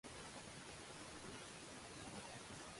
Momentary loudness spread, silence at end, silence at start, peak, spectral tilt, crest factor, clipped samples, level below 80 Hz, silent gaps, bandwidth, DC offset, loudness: 1 LU; 0 s; 0.05 s; -40 dBFS; -3 dB/octave; 14 dB; under 0.1%; -70 dBFS; none; 11.5 kHz; under 0.1%; -53 LUFS